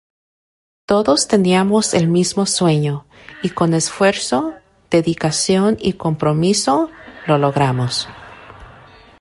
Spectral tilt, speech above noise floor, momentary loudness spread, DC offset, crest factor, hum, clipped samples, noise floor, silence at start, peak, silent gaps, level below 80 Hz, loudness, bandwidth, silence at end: -5 dB/octave; 27 dB; 10 LU; under 0.1%; 16 dB; none; under 0.1%; -43 dBFS; 0.9 s; -2 dBFS; none; -50 dBFS; -16 LUFS; 11.5 kHz; 0.55 s